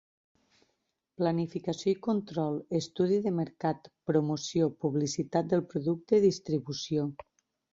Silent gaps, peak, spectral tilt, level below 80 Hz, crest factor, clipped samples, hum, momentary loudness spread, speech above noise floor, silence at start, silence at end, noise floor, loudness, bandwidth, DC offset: none; -12 dBFS; -6.5 dB/octave; -68 dBFS; 18 dB; under 0.1%; none; 6 LU; 50 dB; 1.2 s; 0.6 s; -80 dBFS; -30 LUFS; 7.8 kHz; under 0.1%